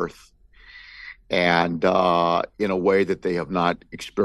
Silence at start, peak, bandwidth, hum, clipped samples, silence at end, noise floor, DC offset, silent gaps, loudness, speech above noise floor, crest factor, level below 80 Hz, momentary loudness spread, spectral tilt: 0 s; -4 dBFS; 12.5 kHz; none; under 0.1%; 0 s; -48 dBFS; under 0.1%; none; -22 LUFS; 26 dB; 18 dB; -54 dBFS; 18 LU; -6 dB/octave